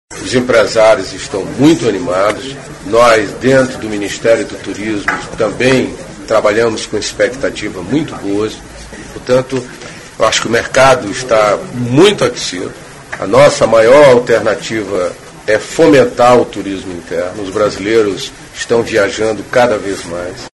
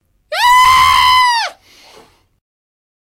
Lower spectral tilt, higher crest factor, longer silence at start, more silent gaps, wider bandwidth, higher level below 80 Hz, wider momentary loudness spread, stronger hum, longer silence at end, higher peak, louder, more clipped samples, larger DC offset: first, -4.5 dB/octave vs 0.5 dB/octave; about the same, 12 dB vs 14 dB; second, 0.1 s vs 0.3 s; neither; second, 12 kHz vs 16 kHz; about the same, -40 dBFS vs -40 dBFS; about the same, 14 LU vs 13 LU; neither; second, 0.1 s vs 1.5 s; about the same, 0 dBFS vs 0 dBFS; second, -12 LUFS vs -9 LUFS; first, 0.3% vs under 0.1%; neither